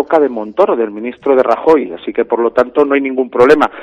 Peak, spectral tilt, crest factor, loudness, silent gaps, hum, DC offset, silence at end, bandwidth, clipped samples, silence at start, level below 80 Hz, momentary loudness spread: 0 dBFS; -6.5 dB/octave; 12 dB; -13 LUFS; none; none; under 0.1%; 0 s; 8.6 kHz; 0.4%; 0 s; -50 dBFS; 9 LU